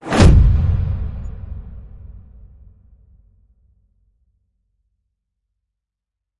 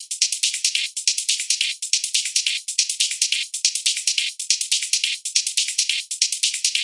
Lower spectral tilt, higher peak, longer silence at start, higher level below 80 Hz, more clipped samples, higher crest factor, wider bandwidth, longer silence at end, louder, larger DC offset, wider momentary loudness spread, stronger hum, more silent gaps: first, -7 dB/octave vs 9 dB/octave; about the same, 0 dBFS vs 0 dBFS; about the same, 0.05 s vs 0 s; first, -24 dBFS vs under -90 dBFS; neither; about the same, 20 dB vs 22 dB; about the same, 11.5 kHz vs 12 kHz; first, 4.2 s vs 0 s; first, -15 LUFS vs -20 LUFS; neither; first, 28 LU vs 2 LU; neither; neither